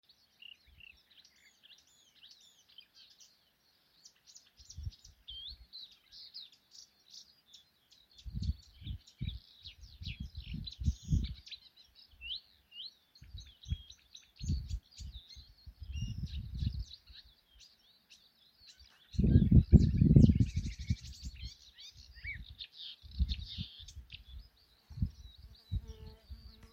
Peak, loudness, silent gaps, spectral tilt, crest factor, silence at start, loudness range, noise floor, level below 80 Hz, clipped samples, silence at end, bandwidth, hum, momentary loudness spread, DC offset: -8 dBFS; -35 LUFS; none; -7 dB/octave; 28 dB; 4.75 s; 22 LU; -72 dBFS; -42 dBFS; under 0.1%; 0.25 s; 7.8 kHz; none; 28 LU; under 0.1%